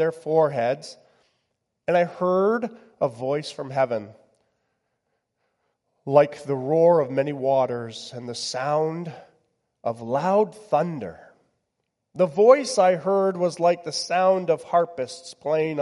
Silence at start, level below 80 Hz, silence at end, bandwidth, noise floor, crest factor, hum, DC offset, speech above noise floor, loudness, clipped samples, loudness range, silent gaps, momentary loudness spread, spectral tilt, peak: 0 s; -74 dBFS; 0 s; 11.5 kHz; -78 dBFS; 20 dB; none; under 0.1%; 56 dB; -23 LUFS; under 0.1%; 6 LU; none; 15 LU; -5.5 dB/octave; -4 dBFS